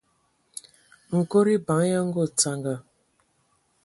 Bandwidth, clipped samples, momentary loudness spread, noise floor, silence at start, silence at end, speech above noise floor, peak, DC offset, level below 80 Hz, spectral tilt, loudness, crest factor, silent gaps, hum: 11.5 kHz; under 0.1%; 20 LU; -69 dBFS; 1.1 s; 1.05 s; 46 dB; -6 dBFS; under 0.1%; -66 dBFS; -5 dB/octave; -24 LUFS; 20 dB; none; none